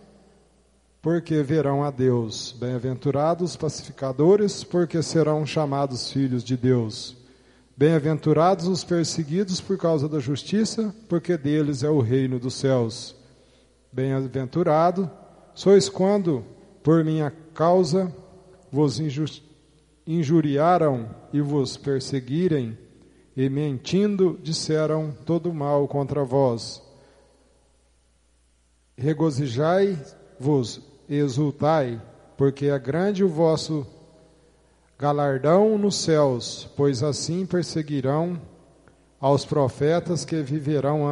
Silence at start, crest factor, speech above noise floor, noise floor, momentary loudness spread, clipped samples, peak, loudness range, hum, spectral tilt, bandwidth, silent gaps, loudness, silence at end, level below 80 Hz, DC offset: 1.05 s; 18 dB; 40 dB; -62 dBFS; 10 LU; under 0.1%; -6 dBFS; 3 LU; none; -6.5 dB/octave; 11 kHz; none; -23 LUFS; 0 s; -60 dBFS; under 0.1%